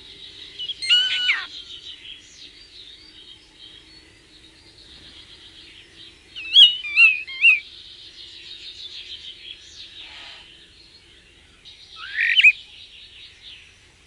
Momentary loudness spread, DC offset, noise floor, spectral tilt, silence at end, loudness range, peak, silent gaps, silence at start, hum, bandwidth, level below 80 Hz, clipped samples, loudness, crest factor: 28 LU; under 0.1%; -51 dBFS; 1.5 dB/octave; 0.6 s; 22 LU; -2 dBFS; none; 0.2 s; none; 11.5 kHz; -60 dBFS; under 0.1%; -15 LUFS; 22 dB